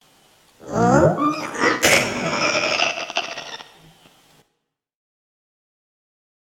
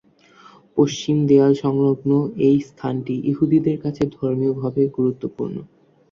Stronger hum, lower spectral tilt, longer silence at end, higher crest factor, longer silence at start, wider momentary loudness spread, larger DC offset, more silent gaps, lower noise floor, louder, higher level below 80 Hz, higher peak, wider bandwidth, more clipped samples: neither; second, -3.5 dB/octave vs -8 dB/octave; first, 2.85 s vs 0.45 s; first, 22 dB vs 16 dB; about the same, 0.65 s vs 0.75 s; first, 14 LU vs 11 LU; neither; neither; first, -76 dBFS vs -50 dBFS; about the same, -19 LUFS vs -20 LUFS; first, -50 dBFS vs -56 dBFS; about the same, -2 dBFS vs -4 dBFS; first, 17.5 kHz vs 7.2 kHz; neither